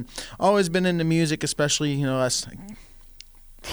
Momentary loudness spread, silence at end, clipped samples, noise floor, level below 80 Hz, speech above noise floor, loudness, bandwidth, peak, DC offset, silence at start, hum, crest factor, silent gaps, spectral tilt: 17 LU; 0 s; under 0.1%; -47 dBFS; -48 dBFS; 23 dB; -23 LUFS; over 20 kHz; -8 dBFS; under 0.1%; 0 s; none; 16 dB; none; -4.5 dB/octave